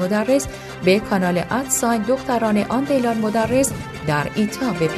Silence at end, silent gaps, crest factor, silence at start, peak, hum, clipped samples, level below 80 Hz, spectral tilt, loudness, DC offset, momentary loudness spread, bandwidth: 0 s; none; 16 dB; 0 s; -4 dBFS; none; under 0.1%; -46 dBFS; -5 dB/octave; -20 LUFS; under 0.1%; 4 LU; 14 kHz